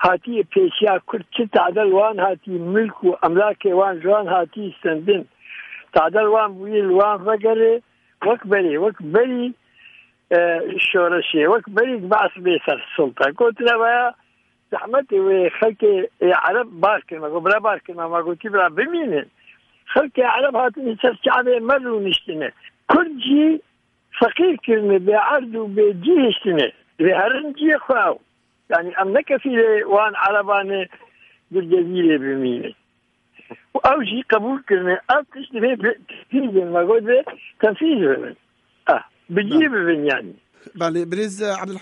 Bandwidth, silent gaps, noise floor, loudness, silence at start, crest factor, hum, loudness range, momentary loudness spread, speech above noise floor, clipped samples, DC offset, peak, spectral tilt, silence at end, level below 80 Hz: 10.5 kHz; none; -65 dBFS; -18 LUFS; 0 s; 16 dB; none; 3 LU; 8 LU; 47 dB; under 0.1%; under 0.1%; -2 dBFS; -6 dB/octave; 0 s; -62 dBFS